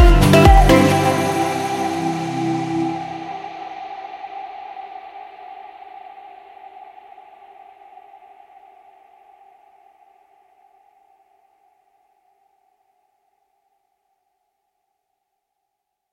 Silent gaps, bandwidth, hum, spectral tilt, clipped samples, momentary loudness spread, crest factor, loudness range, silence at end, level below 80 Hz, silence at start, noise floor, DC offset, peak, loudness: none; 16 kHz; none; -6 dB/octave; under 0.1%; 30 LU; 20 dB; 28 LU; 10.05 s; -26 dBFS; 0 s; -78 dBFS; under 0.1%; 0 dBFS; -17 LUFS